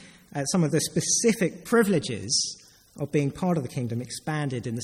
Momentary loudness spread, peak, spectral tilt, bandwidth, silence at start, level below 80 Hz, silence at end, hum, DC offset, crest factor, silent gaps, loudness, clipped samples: 10 LU; -8 dBFS; -4 dB/octave; 16 kHz; 0 s; -60 dBFS; 0 s; none; under 0.1%; 18 dB; none; -26 LUFS; under 0.1%